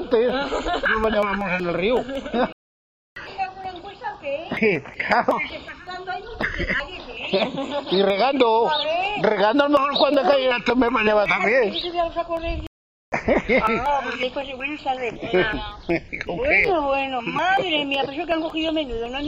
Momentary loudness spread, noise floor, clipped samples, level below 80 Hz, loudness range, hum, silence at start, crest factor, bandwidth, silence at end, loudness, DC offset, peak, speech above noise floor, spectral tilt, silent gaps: 12 LU; under -90 dBFS; under 0.1%; -42 dBFS; 6 LU; none; 0 s; 20 dB; 8.4 kHz; 0 s; -22 LUFS; under 0.1%; -2 dBFS; over 69 dB; -5.5 dB/octave; 2.52-3.16 s, 12.67-13.12 s